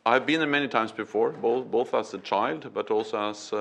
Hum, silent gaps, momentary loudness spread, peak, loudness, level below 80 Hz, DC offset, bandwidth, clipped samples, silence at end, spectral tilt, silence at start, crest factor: none; none; 7 LU; -6 dBFS; -27 LUFS; -74 dBFS; under 0.1%; 9.4 kHz; under 0.1%; 0 s; -4.5 dB/octave; 0.05 s; 20 dB